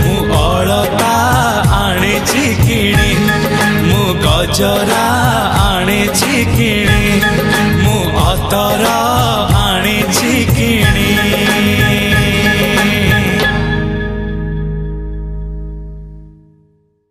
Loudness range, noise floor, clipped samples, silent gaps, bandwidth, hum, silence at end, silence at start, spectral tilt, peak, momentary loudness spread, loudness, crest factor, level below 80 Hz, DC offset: 4 LU; -54 dBFS; under 0.1%; none; 15.5 kHz; none; 0.8 s; 0 s; -4.5 dB/octave; 0 dBFS; 9 LU; -12 LUFS; 12 dB; -22 dBFS; under 0.1%